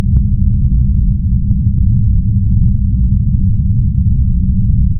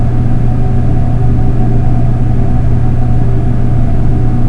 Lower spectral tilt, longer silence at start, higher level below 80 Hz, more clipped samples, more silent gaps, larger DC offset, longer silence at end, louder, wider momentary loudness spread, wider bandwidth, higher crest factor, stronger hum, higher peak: first, -14 dB/octave vs -10 dB/octave; about the same, 0 s vs 0 s; about the same, -14 dBFS vs -12 dBFS; second, under 0.1% vs 0.7%; neither; neither; about the same, 0 s vs 0 s; about the same, -14 LUFS vs -13 LUFS; about the same, 1 LU vs 1 LU; second, 0.6 kHz vs 3.1 kHz; about the same, 10 dB vs 8 dB; neither; about the same, 0 dBFS vs 0 dBFS